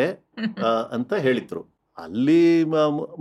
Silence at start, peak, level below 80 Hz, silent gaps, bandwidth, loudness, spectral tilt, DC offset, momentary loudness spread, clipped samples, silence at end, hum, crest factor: 0 s; -8 dBFS; -70 dBFS; none; 8.2 kHz; -22 LUFS; -7 dB/octave; under 0.1%; 16 LU; under 0.1%; 0 s; none; 14 dB